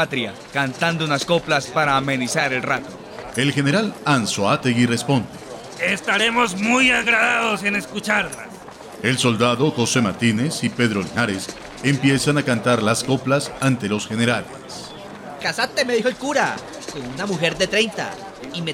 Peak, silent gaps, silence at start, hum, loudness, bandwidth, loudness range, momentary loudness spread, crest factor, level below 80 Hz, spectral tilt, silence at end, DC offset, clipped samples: -6 dBFS; none; 0 s; none; -20 LUFS; 16.5 kHz; 4 LU; 14 LU; 16 dB; -54 dBFS; -4.5 dB/octave; 0 s; under 0.1%; under 0.1%